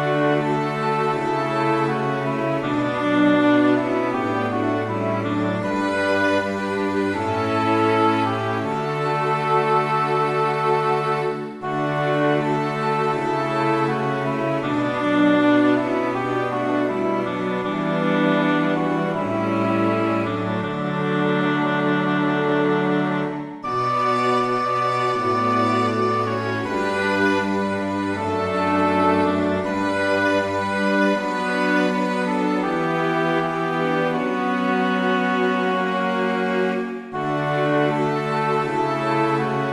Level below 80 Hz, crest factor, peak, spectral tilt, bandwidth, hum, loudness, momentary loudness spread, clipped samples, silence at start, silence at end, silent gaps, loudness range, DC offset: -60 dBFS; 14 dB; -6 dBFS; -6.5 dB/octave; 12 kHz; none; -21 LUFS; 5 LU; under 0.1%; 0 s; 0 s; none; 1 LU; under 0.1%